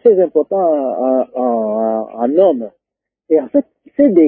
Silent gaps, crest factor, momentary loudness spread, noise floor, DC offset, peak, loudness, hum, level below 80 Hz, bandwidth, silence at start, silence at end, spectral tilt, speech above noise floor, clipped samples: none; 14 dB; 6 LU; -82 dBFS; under 0.1%; 0 dBFS; -15 LUFS; none; -66 dBFS; 3.4 kHz; 0.05 s; 0 s; -13 dB/octave; 70 dB; under 0.1%